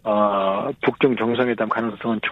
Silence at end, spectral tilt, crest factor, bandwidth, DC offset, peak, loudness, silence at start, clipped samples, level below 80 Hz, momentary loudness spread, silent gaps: 0 s; -8 dB/octave; 16 dB; 5.6 kHz; under 0.1%; -4 dBFS; -21 LUFS; 0.05 s; under 0.1%; -60 dBFS; 5 LU; none